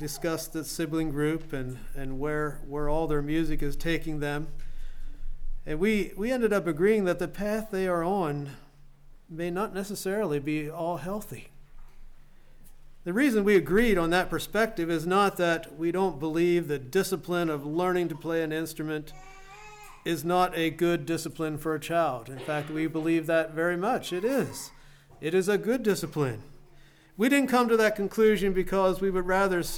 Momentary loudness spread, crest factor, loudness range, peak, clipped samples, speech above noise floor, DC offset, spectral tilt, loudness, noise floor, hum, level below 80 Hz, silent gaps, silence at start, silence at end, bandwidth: 14 LU; 16 dB; 6 LU; -12 dBFS; under 0.1%; 27 dB; under 0.1%; -5.5 dB/octave; -28 LUFS; -54 dBFS; none; -40 dBFS; none; 0 s; 0 s; 18.5 kHz